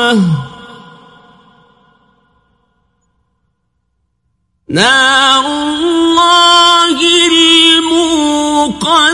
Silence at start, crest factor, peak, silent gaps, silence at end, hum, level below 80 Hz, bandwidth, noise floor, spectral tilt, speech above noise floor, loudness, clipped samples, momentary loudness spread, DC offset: 0 s; 12 dB; 0 dBFS; none; 0 s; none; -48 dBFS; 11.5 kHz; -65 dBFS; -3 dB/octave; 55 dB; -8 LUFS; 0.2%; 9 LU; under 0.1%